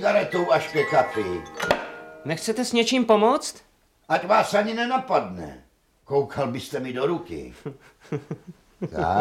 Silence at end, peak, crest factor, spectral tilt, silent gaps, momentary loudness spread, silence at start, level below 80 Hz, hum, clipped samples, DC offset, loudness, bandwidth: 0 s; -4 dBFS; 20 dB; -4.5 dB/octave; none; 17 LU; 0 s; -54 dBFS; none; under 0.1%; under 0.1%; -24 LUFS; 16 kHz